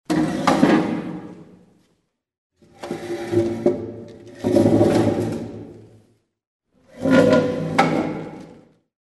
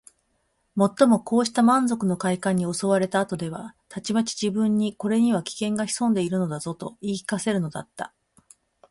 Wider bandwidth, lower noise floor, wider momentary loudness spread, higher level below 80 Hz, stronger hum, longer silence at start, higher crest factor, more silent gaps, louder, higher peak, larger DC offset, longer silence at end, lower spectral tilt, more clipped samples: about the same, 12 kHz vs 11.5 kHz; about the same, -69 dBFS vs -71 dBFS; first, 22 LU vs 14 LU; first, -52 dBFS vs -64 dBFS; neither; second, 0.1 s vs 0.75 s; about the same, 20 dB vs 18 dB; first, 2.38-2.50 s, 6.47-6.60 s vs none; first, -20 LUFS vs -24 LUFS; first, -2 dBFS vs -6 dBFS; neither; second, 0.5 s vs 0.85 s; about the same, -6.5 dB/octave vs -5.5 dB/octave; neither